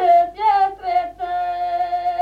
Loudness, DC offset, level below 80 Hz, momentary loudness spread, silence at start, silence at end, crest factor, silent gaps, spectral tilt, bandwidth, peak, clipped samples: -20 LUFS; under 0.1%; -52 dBFS; 8 LU; 0 s; 0 s; 12 dB; none; -5 dB/octave; 5.2 kHz; -6 dBFS; under 0.1%